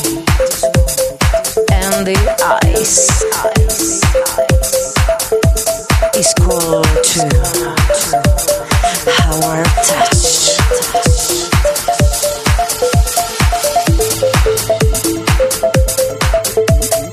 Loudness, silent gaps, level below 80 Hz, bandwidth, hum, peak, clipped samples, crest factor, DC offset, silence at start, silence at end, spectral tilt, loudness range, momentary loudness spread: -12 LUFS; none; -18 dBFS; 15.5 kHz; none; 0 dBFS; under 0.1%; 12 dB; 0.2%; 0 s; 0 s; -3.5 dB/octave; 1 LU; 4 LU